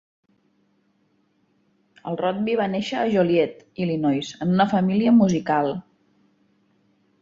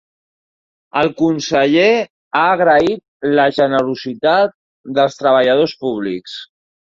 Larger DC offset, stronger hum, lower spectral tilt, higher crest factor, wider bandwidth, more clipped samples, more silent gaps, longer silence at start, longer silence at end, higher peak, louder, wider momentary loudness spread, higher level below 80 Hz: neither; first, 50 Hz at -50 dBFS vs none; first, -7 dB/octave vs -5 dB/octave; about the same, 16 dB vs 14 dB; about the same, 7.6 kHz vs 7.6 kHz; neither; second, none vs 2.10-2.31 s, 3.08-3.20 s, 4.54-4.84 s; first, 2.05 s vs 0.95 s; first, 1.4 s vs 0.5 s; second, -8 dBFS vs -2 dBFS; second, -22 LUFS vs -15 LUFS; about the same, 10 LU vs 10 LU; about the same, -62 dBFS vs -58 dBFS